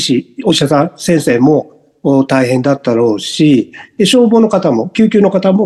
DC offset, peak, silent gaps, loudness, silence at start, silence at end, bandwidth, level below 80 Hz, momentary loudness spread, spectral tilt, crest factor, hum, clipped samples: under 0.1%; 0 dBFS; none; -11 LUFS; 0 s; 0 s; 12.5 kHz; -54 dBFS; 5 LU; -5.5 dB/octave; 10 dB; none; under 0.1%